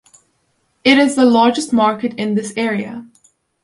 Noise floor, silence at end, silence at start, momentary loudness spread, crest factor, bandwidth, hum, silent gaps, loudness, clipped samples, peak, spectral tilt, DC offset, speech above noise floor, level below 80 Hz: -64 dBFS; 0.6 s; 0.85 s; 11 LU; 16 dB; 11.5 kHz; none; none; -15 LUFS; under 0.1%; 0 dBFS; -4.5 dB/octave; under 0.1%; 50 dB; -60 dBFS